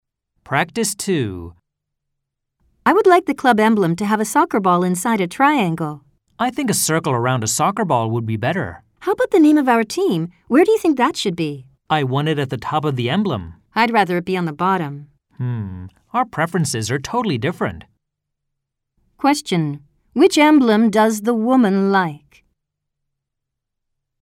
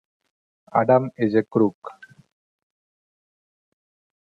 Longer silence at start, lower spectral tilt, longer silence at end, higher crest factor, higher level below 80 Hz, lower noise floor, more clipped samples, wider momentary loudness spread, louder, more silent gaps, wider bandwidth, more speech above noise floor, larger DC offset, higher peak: second, 0.5 s vs 0.75 s; second, -5 dB/octave vs -10 dB/octave; second, 2.05 s vs 2.3 s; about the same, 18 dB vs 20 dB; first, -54 dBFS vs -70 dBFS; second, -79 dBFS vs under -90 dBFS; neither; second, 12 LU vs 16 LU; first, -18 LUFS vs -21 LUFS; second, none vs 1.75-1.82 s; first, 16.5 kHz vs 5 kHz; second, 62 dB vs over 70 dB; neither; about the same, -2 dBFS vs -4 dBFS